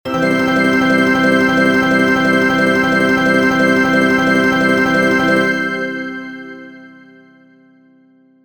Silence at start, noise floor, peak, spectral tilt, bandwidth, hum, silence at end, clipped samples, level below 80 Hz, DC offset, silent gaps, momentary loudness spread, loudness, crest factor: 0.05 s; -50 dBFS; -2 dBFS; -5.5 dB/octave; over 20 kHz; none; 1.55 s; under 0.1%; -48 dBFS; 0.4%; none; 11 LU; -13 LUFS; 14 dB